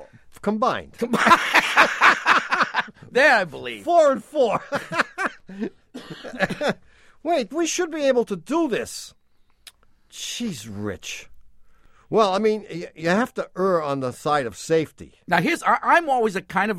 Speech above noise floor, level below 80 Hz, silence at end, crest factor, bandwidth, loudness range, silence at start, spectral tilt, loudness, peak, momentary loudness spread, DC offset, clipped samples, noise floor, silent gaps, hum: 29 dB; -58 dBFS; 0 s; 22 dB; 16 kHz; 9 LU; 0 s; -4 dB/octave; -21 LUFS; -2 dBFS; 17 LU; under 0.1%; under 0.1%; -51 dBFS; none; none